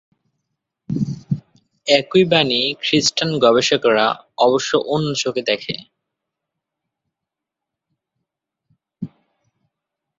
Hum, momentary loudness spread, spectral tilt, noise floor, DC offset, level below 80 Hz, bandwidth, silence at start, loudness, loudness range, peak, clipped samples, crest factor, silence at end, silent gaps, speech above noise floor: none; 14 LU; -4 dB/octave; -84 dBFS; under 0.1%; -60 dBFS; 7.8 kHz; 0.9 s; -17 LUFS; 11 LU; -2 dBFS; under 0.1%; 20 dB; 1.1 s; none; 67 dB